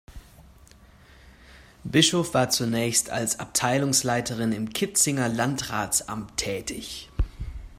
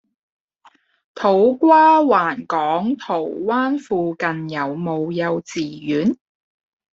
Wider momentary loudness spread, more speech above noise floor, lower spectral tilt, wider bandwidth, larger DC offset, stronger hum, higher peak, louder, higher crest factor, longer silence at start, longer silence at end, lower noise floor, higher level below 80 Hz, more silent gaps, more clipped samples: about the same, 12 LU vs 12 LU; second, 27 dB vs 37 dB; second, -3 dB/octave vs -6.5 dB/octave; first, 16 kHz vs 7.8 kHz; neither; neither; second, -6 dBFS vs -2 dBFS; second, -24 LUFS vs -18 LUFS; first, 22 dB vs 16 dB; second, 0.1 s vs 1.15 s; second, 0 s vs 0.75 s; about the same, -52 dBFS vs -55 dBFS; first, -40 dBFS vs -64 dBFS; neither; neither